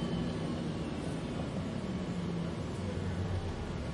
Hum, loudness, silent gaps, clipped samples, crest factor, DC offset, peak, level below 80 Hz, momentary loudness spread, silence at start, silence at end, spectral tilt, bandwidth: none; -37 LUFS; none; under 0.1%; 12 dB; under 0.1%; -24 dBFS; -48 dBFS; 2 LU; 0 s; 0 s; -7 dB/octave; 11.5 kHz